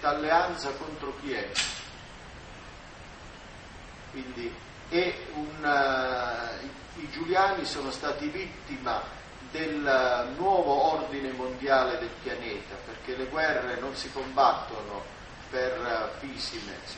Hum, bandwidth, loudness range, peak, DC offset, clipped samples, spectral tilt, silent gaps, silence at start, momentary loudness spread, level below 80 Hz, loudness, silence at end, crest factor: none; 8.4 kHz; 9 LU; -10 dBFS; under 0.1%; under 0.1%; -3.5 dB/octave; none; 0 s; 20 LU; -52 dBFS; -29 LUFS; 0 s; 22 dB